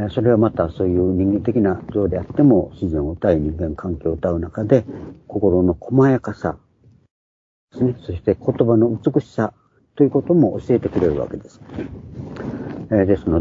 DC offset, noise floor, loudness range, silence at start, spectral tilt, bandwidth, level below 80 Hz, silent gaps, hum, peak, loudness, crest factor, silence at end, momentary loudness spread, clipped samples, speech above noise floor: under 0.1%; under -90 dBFS; 3 LU; 0 s; -10 dB/octave; 7.4 kHz; -40 dBFS; 7.11-7.68 s; none; 0 dBFS; -19 LUFS; 18 dB; 0 s; 14 LU; under 0.1%; over 72 dB